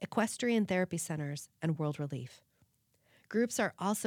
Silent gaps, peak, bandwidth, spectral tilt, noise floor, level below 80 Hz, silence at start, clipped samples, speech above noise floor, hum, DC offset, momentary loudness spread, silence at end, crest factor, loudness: none; -16 dBFS; 19 kHz; -5 dB/octave; -72 dBFS; -80 dBFS; 0 s; under 0.1%; 39 dB; none; under 0.1%; 10 LU; 0 s; 18 dB; -34 LUFS